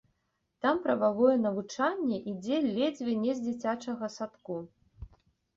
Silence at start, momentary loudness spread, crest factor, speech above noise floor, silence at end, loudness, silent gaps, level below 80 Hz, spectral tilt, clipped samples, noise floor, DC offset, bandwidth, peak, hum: 0.65 s; 12 LU; 18 dB; 49 dB; 0.5 s; -31 LUFS; none; -62 dBFS; -6 dB/octave; under 0.1%; -79 dBFS; under 0.1%; 7.8 kHz; -12 dBFS; none